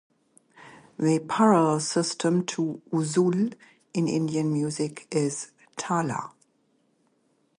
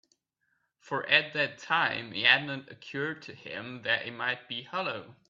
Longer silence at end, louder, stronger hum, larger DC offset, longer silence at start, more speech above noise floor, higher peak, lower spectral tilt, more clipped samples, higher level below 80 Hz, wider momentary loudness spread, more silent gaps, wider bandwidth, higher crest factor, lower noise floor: first, 1.3 s vs 0.15 s; about the same, -26 LUFS vs -28 LUFS; neither; neither; second, 0.6 s vs 0.85 s; about the same, 44 dB vs 46 dB; about the same, -6 dBFS vs -6 dBFS; first, -5.5 dB/octave vs -4 dB/octave; neither; first, -72 dBFS vs -78 dBFS; second, 13 LU vs 17 LU; neither; first, 11.5 kHz vs 7.6 kHz; second, 20 dB vs 26 dB; second, -69 dBFS vs -77 dBFS